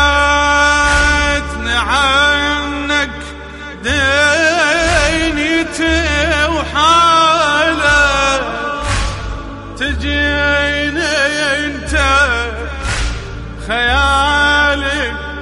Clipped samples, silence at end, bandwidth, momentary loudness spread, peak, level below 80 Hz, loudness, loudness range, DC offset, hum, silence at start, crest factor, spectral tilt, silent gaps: under 0.1%; 0 s; 11.5 kHz; 11 LU; -2 dBFS; -24 dBFS; -13 LUFS; 4 LU; under 0.1%; none; 0 s; 12 dB; -3.5 dB/octave; none